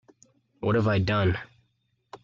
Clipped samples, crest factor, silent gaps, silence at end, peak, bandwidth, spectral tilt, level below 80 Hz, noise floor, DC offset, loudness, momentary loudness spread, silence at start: under 0.1%; 16 dB; none; 0.05 s; -12 dBFS; 7.2 kHz; -8 dB/octave; -52 dBFS; -72 dBFS; under 0.1%; -26 LUFS; 9 LU; 0.6 s